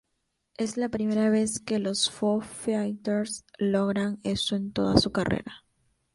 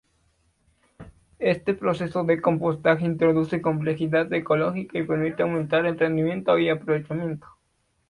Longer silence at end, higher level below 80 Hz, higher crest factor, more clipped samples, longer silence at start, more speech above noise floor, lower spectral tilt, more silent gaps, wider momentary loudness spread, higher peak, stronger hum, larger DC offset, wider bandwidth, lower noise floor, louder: second, 0.55 s vs 0.7 s; first, -52 dBFS vs -58 dBFS; about the same, 22 dB vs 18 dB; neither; second, 0.6 s vs 1 s; first, 51 dB vs 47 dB; second, -4.5 dB/octave vs -8.5 dB/octave; neither; about the same, 7 LU vs 5 LU; first, -4 dBFS vs -8 dBFS; neither; neither; about the same, 11.5 kHz vs 11 kHz; first, -78 dBFS vs -70 dBFS; second, -27 LUFS vs -24 LUFS